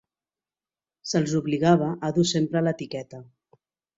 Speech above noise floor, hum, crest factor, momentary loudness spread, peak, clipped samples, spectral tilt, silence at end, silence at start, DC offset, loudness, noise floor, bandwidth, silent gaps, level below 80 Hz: over 66 dB; none; 20 dB; 17 LU; -6 dBFS; under 0.1%; -5.5 dB/octave; 0.75 s; 1.05 s; under 0.1%; -24 LUFS; under -90 dBFS; 8 kHz; none; -64 dBFS